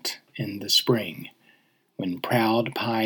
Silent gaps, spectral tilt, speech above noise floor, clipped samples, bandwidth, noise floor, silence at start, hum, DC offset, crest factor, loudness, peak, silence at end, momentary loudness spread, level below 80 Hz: none; -4 dB/octave; 38 dB; under 0.1%; over 20 kHz; -63 dBFS; 0.05 s; none; under 0.1%; 18 dB; -25 LUFS; -8 dBFS; 0 s; 19 LU; -76 dBFS